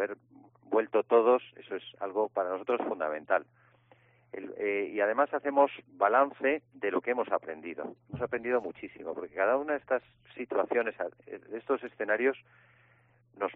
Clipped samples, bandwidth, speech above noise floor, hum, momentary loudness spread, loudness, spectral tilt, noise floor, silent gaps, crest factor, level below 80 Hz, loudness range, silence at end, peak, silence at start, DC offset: under 0.1%; 3.9 kHz; 34 dB; none; 16 LU; -31 LUFS; -3.5 dB/octave; -65 dBFS; none; 20 dB; -74 dBFS; 4 LU; 0 s; -12 dBFS; 0 s; under 0.1%